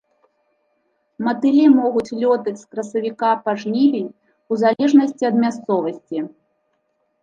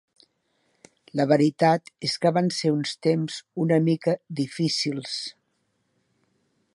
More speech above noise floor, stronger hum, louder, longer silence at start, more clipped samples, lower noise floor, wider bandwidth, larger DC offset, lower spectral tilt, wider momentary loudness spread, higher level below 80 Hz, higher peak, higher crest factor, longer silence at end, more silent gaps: about the same, 51 dB vs 49 dB; neither; first, -18 LUFS vs -24 LUFS; about the same, 1.2 s vs 1.15 s; neither; second, -68 dBFS vs -73 dBFS; second, 7.6 kHz vs 11.5 kHz; neither; about the same, -6.5 dB/octave vs -5.5 dB/octave; about the same, 13 LU vs 11 LU; about the same, -70 dBFS vs -74 dBFS; first, -2 dBFS vs -6 dBFS; about the same, 16 dB vs 20 dB; second, 0.95 s vs 1.45 s; neither